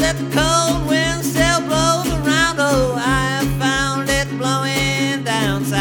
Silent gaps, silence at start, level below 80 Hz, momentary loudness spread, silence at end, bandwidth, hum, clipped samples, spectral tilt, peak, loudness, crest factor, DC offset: none; 0 s; -32 dBFS; 3 LU; 0 s; over 20 kHz; none; under 0.1%; -4 dB/octave; -2 dBFS; -17 LUFS; 16 dB; under 0.1%